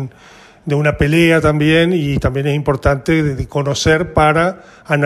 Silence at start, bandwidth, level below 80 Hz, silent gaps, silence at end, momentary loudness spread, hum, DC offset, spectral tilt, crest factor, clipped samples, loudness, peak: 0 s; 13.5 kHz; -30 dBFS; none; 0 s; 8 LU; none; under 0.1%; -6 dB/octave; 14 dB; under 0.1%; -14 LUFS; 0 dBFS